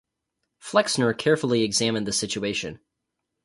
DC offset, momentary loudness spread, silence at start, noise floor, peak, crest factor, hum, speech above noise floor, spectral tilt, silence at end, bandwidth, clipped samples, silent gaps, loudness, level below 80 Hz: under 0.1%; 8 LU; 0.65 s; -81 dBFS; -4 dBFS; 22 dB; none; 58 dB; -3.5 dB/octave; 0.7 s; 11.5 kHz; under 0.1%; none; -23 LUFS; -60 dBFS